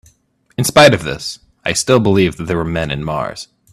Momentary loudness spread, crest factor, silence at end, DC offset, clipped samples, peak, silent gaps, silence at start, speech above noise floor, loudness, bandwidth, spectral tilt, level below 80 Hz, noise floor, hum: 16 LU; 16 dB; 0.3 s; under 0.1%; under 0.1%; 0 dBFS; none; 0.6 s; 41 dB; -15 LUFS; 15.5 kHz; -4.5 dB/octave; -40 dBFS; -55 dBFS; none